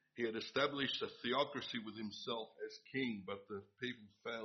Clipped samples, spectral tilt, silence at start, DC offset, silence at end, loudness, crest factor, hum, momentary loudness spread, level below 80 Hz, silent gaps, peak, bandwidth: under 0.1%; -2 dB/octave; 0.15 s; under 0.1%; 0 s; -42 LUFS; 22 dB; none; 10 LU; -82 dBFS; none; -22 dBFS; 6.4 kHz